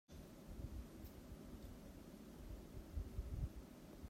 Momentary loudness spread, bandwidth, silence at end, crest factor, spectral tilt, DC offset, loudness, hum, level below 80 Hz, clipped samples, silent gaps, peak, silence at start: 9 LU; 16 kHz; 0 s; 20 dB; -6.5 dB/octave; under 0.1%; -54 LUFS; none; -54 dBFS; under 0.1%; none; -32 dBFS; 0.1 s